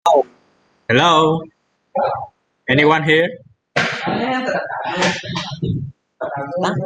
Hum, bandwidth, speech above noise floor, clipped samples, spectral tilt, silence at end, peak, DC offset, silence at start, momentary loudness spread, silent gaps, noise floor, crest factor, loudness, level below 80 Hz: none; 9.8 kHz; 41 dB; under 0.1%; -5 dB/octave; 0 s; -2 dBFS; under 0.1%; 0.05 s; 15 LU; none; -58 dBFS; 18 dB; -18 LUFS; -52 dBFS